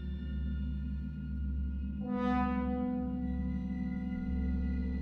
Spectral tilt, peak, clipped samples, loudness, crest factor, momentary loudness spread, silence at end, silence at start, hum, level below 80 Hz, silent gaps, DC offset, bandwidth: -10 dB/octave; -20 dBFS; under 0.1%; -36 LUFS; 14 dB; 7 LU; 0 s; 0 s; none; -38 dBFS; none; under 0.1%; 4.7 kHz